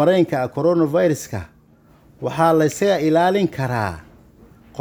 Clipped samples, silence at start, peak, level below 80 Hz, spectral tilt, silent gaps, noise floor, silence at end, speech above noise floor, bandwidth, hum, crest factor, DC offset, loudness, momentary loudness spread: under 0.1%; 0 s; -2 dBFS; -52 dBFS; -6 dB/octave; none; -52 dBFS; 0 s; 34 dB; over 20 kHz; none; 16 dB; under 0.1%; -19 LUFS; 14 LU